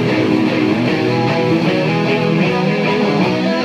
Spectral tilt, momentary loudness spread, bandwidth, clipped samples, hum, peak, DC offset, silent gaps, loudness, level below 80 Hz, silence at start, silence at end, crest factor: -7 dB/octave; 1 LU; 12 kHz; under 0.1%; none; -2 dBFS; under 0.1%; none; -15 LUFS; -52 dBFS; 0 s; 0 s; 12 dB